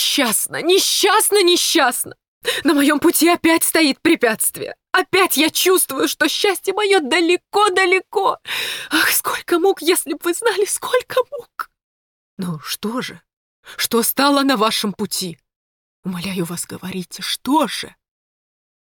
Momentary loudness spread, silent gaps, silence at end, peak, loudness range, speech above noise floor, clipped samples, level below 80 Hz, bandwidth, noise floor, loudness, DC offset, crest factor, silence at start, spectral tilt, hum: 14 LU; 2.28-2.41 s, 11.83-12.37 s, 13.33-13.63 s, 15.56-16.03 s; 0.95 s; -2 dBFS; 8 LU; over 72 dB; under 0.1%; -62 dBFS; 19.5 kHz; under -90 dBFS; -17 LUFS; under 0.1%; 16 dB; 0 s; -2 dB/octave; none